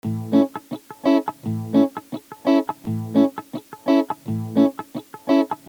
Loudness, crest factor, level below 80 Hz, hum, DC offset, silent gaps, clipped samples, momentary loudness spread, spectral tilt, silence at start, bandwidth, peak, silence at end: -21 LUFS; 16 dB; -70 dBFS; none; under 0.1%; none; under 0.1%; 14 LU; -7.5 dB/octave; 0.05 s; over 20 kHz; -6 dBFS; 0.1 s